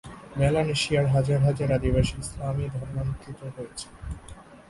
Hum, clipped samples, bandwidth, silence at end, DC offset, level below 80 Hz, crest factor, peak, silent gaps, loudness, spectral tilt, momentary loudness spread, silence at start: none; under 0.1%; 11.5 kHz; 0.1 s; under 0.1%; -40 dBFS; 16 dB; -10 dBFS; none; -25 LUFS; -6 dB/octave; 16 LU; 0.05 s